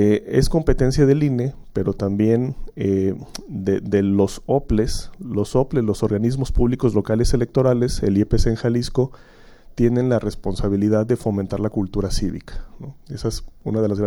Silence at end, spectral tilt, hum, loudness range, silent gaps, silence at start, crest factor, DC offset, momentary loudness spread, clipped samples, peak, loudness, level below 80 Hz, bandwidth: 0 s; -7 dB/octave; none; 3 LU; none; 0 s; 16 dB; under 0.1%; 10 LU; under 0.1%; -4 dBFS; -21 LUFS; -30 dBFS; 16.5 kHz